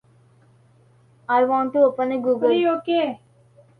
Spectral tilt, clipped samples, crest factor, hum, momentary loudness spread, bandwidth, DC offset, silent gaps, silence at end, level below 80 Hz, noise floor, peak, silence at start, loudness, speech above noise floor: -7 dB/octave; under 0.1%; 16 dB; none; 8 LU; 4.8 kHz; under 0.1%; none; 0.65 s; -70 dBFS; -55 dBFS; -6 dBFS; 1.3 s; -20 LUFS; 36 dB